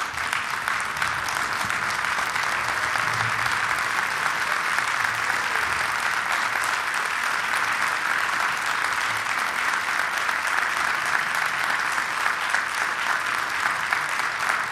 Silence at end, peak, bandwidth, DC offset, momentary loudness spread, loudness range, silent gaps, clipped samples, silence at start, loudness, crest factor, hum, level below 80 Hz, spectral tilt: 0 s; -4 dBFS; 16 kHz; under 0.1%; 2 LU; 1 LU; none; under 0.1%; 0 s; -23 LUFS; 20 dB; none; -58 dBFS; -1 dB/octave